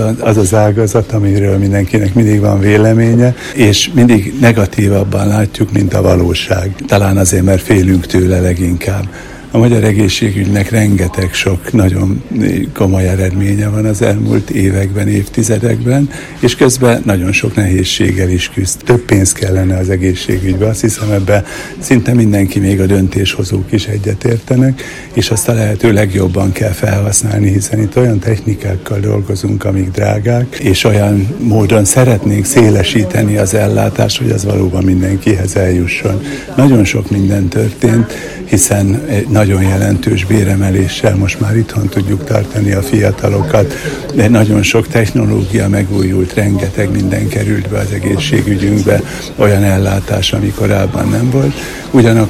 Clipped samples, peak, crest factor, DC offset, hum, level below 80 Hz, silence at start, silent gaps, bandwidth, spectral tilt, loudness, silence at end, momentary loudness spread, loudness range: 0.6%; 0 dBFS; 10 dB; under 0.1%; none; -32 dBFS; 0 s; none; 15.5 kHz; -5.5 dB/octave; -11 LUFS; 0 s; 6 LU; 3 LU